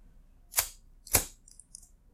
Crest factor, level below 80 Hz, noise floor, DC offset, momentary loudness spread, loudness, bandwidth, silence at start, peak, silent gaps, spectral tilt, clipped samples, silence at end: 32 dB; -50 dBFS; -57 dBFS; under 0.1%; 23 LU; -30 LUFS; 16 kHz; 0.55 s; -6 dBFS; none; -1 dB/octave; under 0.1%; 0.8 s